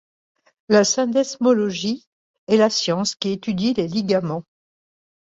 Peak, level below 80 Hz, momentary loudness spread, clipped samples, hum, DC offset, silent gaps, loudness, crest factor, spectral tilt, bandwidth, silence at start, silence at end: -2 dBFS; -62 dBFS; 9 LU; under 0.1%; none; under 0.1%; 2.07-2.47 s; -20 LUFS; 18 dB; -4.5 dB/octave; 8 kHz; 0.7 s; 1 s